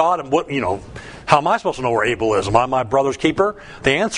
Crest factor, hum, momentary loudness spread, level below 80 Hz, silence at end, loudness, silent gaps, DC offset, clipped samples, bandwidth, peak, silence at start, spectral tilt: 18 dB; none; 6 LU; -44 dBFS; 0 s; -18 LUFS; none; under 0.1%; under 0.1%; 11 kHz; 0 dBFS; 0 s; -5 dB/octave